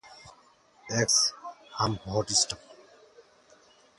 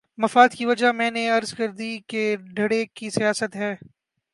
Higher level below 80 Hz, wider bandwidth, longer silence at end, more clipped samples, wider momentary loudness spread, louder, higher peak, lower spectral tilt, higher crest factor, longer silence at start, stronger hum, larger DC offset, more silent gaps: first, -58 dBFS vs -70 dBFS; about the same, 11.5 kHz vs 11.5 kHz; first, 1.25 s vs 0.6 s; neither; first, 17 LU vs 12 LU; second, -26 LUFS vs -22 LUFS; second, -10 dBFS vs -2 dBFS; second, -2 dB/octave vs -4 dB/octave; about the same, 22 dB vs 22 dB; second, 0.05 s vs 0.2 s; neither; neither; neither